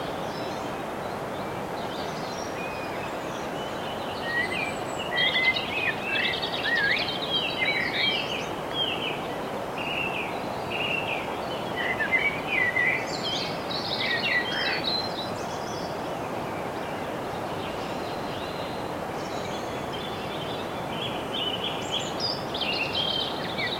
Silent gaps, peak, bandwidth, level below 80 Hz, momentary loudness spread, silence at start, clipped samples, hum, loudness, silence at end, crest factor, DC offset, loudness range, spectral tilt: none; -12 dBFS; 16.5 kHz; -56 dBFS; 9 LU; 0 s; under 0.1%; none; -28 LUFS; 0 s; 16 dB; under 0.1%; 7 LU; -3.5 dB/octave